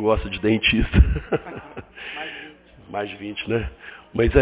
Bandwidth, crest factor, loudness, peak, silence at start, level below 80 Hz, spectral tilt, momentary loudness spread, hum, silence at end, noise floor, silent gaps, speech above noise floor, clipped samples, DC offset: 4 kHz; 20 dB; -23 LUFS; -2 dBFS; 0 s; -28 dBFS; -10.5 dB/octave; 19 LU; none; 0 s; -44 dBFS; none; 23 dB; under 0.1%; under 0.1%